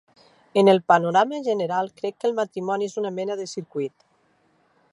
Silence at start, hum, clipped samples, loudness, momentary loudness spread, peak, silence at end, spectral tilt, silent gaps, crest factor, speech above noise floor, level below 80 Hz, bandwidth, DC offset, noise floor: 0.55 s; none; under 0.1%; -23 LUFS; 13 LU; -4 dBFS; 1.05 s; -5.5 dB/octave; none; 20 dB; 42 dB; -76 dBFS; 11.5 kHz; under 0.1%; -64 dBFS